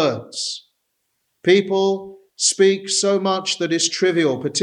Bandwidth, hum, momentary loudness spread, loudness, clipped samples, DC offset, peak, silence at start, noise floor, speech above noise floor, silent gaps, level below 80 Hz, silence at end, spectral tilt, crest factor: 11.5 kHz; none; 10 LU; -19 LUFS; under 0.1%; under 0.1%; -2 dBFS; 0 s; -72 dBFS; 53 dB; none; -72 dBFS; 0 s; -3 dB/octave; 18 dB